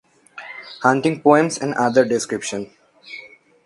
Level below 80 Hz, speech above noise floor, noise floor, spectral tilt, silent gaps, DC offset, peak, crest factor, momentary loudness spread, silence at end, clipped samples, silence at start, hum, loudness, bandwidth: -66 dBFS; 25 dB; -43 dBFS; -5 dB/octave; none; under 0.1%; 0 dBFS; 20 dB; 21 LU; 0.4 s; under 0.1%; 0.35 s; none; -18 LUFS; 11.5 kHz